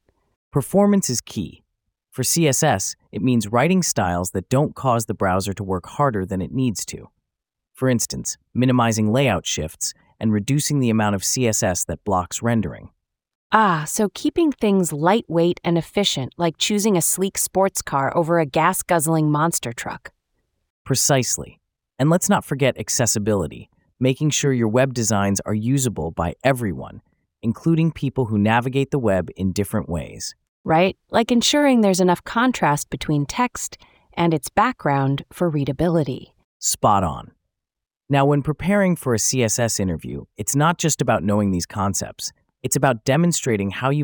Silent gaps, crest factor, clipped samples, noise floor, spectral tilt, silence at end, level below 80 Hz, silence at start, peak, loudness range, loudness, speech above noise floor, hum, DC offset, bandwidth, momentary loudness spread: 13.35-13.50 s, 20.70-20.85 s, 30.49-30.64 s, 36.44-36.60 s; 20 dB; under 0.1%; -86 dBFS; -4.5 dB/octave; 0 s; -50 dBFS; 0.55 s; 0 dBFS; 3 LU; -20 LUFS; 66 dB; none; under 0.1%; over 20 kHz; 9 LU